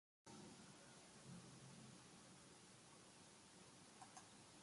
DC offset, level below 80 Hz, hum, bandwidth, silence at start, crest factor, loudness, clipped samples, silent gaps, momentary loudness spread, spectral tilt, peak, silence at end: under 0.1%; -86 dBFS; none; 11.5 kHz; 0.25 s; 18 dB; -63 LUFS; under 0.1%; none; 4 LU; -3.5 dB/octave; -46 dBFS; 0 s